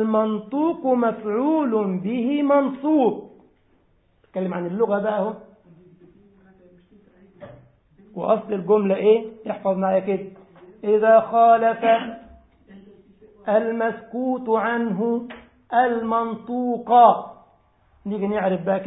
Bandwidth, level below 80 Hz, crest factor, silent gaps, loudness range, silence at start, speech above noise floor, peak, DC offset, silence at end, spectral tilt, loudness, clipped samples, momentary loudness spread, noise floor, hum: 4 kHz; -64 dBFS; 20 dB; none; 8 LU; 0 s; 41 dB; -2 dBFS; under 0.1%; 0 s; -11.5 dB/octave; -21 LUFS; under 0.1%; 14 LU; -61 dBFS; none